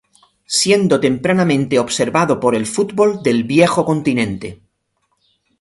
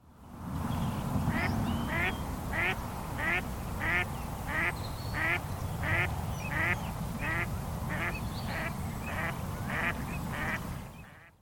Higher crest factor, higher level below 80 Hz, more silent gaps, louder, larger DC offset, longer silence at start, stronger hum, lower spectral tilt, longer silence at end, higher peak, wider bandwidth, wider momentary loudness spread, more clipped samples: about the same, 16 dB vs 18 dB; second, -52 dBFS vs -44 dBFS; neither; first, -15 LUFS vs -33 LUFS; neither; first, 0.5 s vs 0.05 s; neither; about the same, -4.5 dB/octave vs -5.5 dB/octave; first, 1.05 s vs 0.1 s; first, 0 dBFS vs -16 dBFS; second, 11.5 kHz vs 17.5 kHz; about the same, 6 LU vs 8 LU; neither